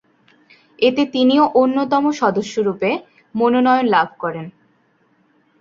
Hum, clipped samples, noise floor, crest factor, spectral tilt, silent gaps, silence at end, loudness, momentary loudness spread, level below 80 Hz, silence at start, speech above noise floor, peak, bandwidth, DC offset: none; under 0.1%; -60 dBFS; 16 dB; -5.5 dB/octave; none; 1.1 s; -17 LUFS; 12 LU; -62 dBFS; 0.8 s; 43 dB; -2 dBFS; 7.4 kHz; under 0.1%